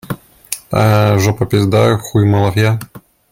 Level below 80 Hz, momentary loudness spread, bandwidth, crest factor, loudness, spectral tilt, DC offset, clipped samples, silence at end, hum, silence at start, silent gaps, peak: -44 dBFS; 14 LU; 16.5 kHz; 14 dB; -13 LUFS; -6.5 dB/octave; under 0.1%; under 0.1%; 0.35 s; none; 0.1 s; none; 0 dBFS